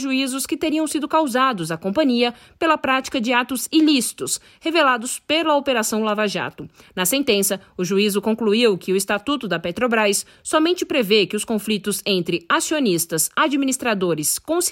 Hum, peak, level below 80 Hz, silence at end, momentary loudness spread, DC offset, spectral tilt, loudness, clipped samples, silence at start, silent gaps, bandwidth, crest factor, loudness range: none; -4 dBFS; -60 dBFS; 0 s; 6 LU; under 0.1%; -3 dB/octave; -20 LUFS; under 0.1%; 0 s; none; 16.5 kHz; 16 dB; 1 LU